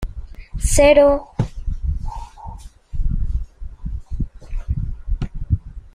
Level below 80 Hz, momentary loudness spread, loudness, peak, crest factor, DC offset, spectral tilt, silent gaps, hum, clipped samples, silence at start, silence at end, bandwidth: -24 dBFS; 23 LU; -20 LUFS; -2 dBFS; 18 dB; under 0.1%; -5.5 dB/octave; none; none; under 0.1%; 0 s; 0.05 s; 15 kHz